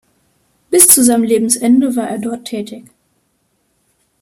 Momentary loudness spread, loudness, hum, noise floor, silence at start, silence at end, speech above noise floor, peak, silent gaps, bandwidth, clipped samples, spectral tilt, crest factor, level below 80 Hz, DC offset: 18 LU; -11 LUFS; none; -63 dBFS; 0.7 s; 1.4 s; 49 dB; 0 dBFS; none; 16 kHz; 0.2%; -2.5 dB/octave; 16 dB; -56 dBFS; under 0.1%